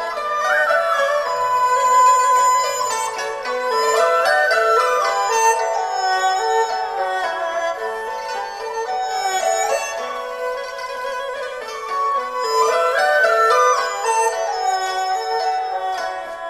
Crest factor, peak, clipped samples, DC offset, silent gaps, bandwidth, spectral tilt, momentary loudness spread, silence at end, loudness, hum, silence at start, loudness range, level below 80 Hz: 14 dB; -4 dBFS; under 0.1%; under 0.1%; none; 14 kHz; 0.5 dB/octave; 11 LU; 0 s; -18 LUFS; none; 0 s; 6 LU; -60 dBFS